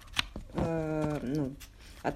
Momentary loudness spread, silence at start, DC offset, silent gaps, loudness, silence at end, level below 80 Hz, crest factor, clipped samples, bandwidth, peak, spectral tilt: 11 LU; 0 s; under 0.1%; none; -34 LUFS; 0 s; -48 dBFS; 24 dB; under 0.1%; 15.5 kHz; -10 dBFS; -5.5 dB/octave